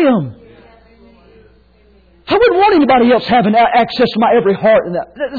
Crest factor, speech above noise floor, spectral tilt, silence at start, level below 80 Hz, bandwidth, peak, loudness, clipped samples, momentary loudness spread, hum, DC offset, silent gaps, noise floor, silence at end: 10 dB; 37 dB; -8 dB/octave; 0 s; -44 dBFS; 4.9 kHz; -2 dBFS; -11 LUFS; under 0.1%; 8 LU; none; under 0.1%; none; -48 dBFS; 0 s